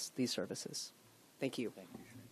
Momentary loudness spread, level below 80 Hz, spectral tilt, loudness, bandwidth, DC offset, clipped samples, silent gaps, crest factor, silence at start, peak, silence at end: 16 LU; -84 dBFS; -3.5 dB/octave; -42 LUFS; 14 kHz; under 0.1%; under 0.1%; none; 18 dB; 0 s; -26 dBFS; 0 s